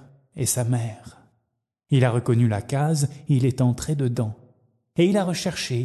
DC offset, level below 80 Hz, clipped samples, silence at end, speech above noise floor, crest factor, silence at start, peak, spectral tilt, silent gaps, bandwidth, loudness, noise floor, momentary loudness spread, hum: under 0.1%; -52 dBFS; under 0.1%; 0 s; 52 dB; 16 dB; 0.35 s; -6 dBFS; -6 dB/octave; none; 12.5 kHz; -23 LUFS; -74 dBFS; 9 LU; none